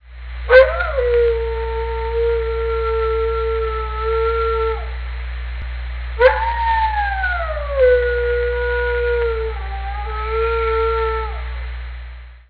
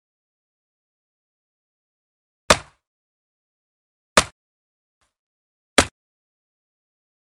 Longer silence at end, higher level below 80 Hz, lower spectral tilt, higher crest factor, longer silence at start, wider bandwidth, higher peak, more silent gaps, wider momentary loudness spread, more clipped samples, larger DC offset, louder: second, 0.1 s vs 1.45 s; first, -26 dBFS vs -46 dBFS; first, -7.5 dB/octave vs -2 dB/octave; second, 18 dB vs 28 dB; second, 0.05 s vs 2.5 s; second, 5 kHz vs 12 kHz; about the same, 0 dBFS vs 0 dBFS; second, none vs 2.87-4.16 s, 4.32-5.01 s, 5.19-5.76 s; first, 14 LU vs 5 LU; neither; neither; about the same, -19 LUFS vs -20 LUFS